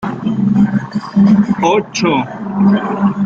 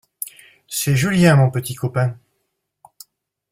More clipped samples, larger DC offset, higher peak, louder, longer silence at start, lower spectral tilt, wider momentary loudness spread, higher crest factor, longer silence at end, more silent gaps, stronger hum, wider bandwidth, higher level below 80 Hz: neither; neither; about the same, -2 dBFS vs -2 dBFS; first, -14 LUFS vs -18 LUFS; second, 0 s vs 0.2 s; about the same, -6.5 dB/octave vs -5.5 dB/octave; second, 7 LU vs 18 LU; second, 12 dB vs 18 dB; second, 0 s vs 1.35 s; neither; neither; second, 7.2 kHz vs 16.5 kHz; about the same, -50 dBFS vs -52 dBFS